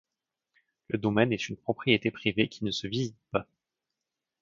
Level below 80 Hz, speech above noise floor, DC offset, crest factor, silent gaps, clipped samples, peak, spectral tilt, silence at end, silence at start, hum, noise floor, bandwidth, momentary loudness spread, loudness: -62 dBFS; 59 dB; under 0.1%; 26 dB; none; under 0.1%; -6 dBFS; -5.5 dB/octave; 1 s; 0.9 s; none; -88 dBFS; 7.8 kHz; 8 LU; -29 LUFS